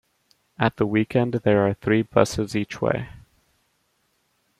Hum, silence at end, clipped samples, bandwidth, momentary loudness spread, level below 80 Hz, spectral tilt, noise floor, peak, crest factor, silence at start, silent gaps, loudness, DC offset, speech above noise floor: none; 1.4 s; under 0.1%; 14.5 kHz; 6 LU; -52 dBFS; -6.5 dB/octave; -69 dBFS; -2 dBFS; 22 dB; 0.6 s; none; -22 LUFS; under 0.1%; 47 dB